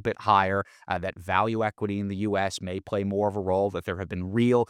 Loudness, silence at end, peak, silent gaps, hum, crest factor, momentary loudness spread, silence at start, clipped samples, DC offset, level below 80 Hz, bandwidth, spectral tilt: -27 LUFS; 0.05 s; -6 dBFS; none; none; 20 dB; 10 LU; 0 s; under 0.1%; under 0.1%; -62 dBFS; 14.5 kHz; -6.5 dB/octave